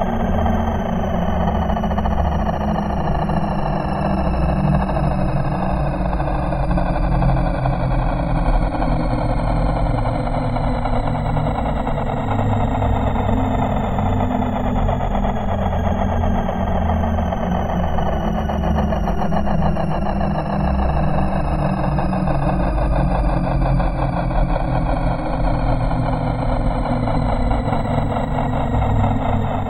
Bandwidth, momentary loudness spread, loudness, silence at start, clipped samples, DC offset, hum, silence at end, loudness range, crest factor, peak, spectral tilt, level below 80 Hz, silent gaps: 8.8 kHz; 2 LU; -20 LUFS; 0 s; under 0.1%; under 0.1%; none; 0 s; 1 LU; 14 dB; -4 dBFS; -8.5 dB/octave; -22 dBFS; none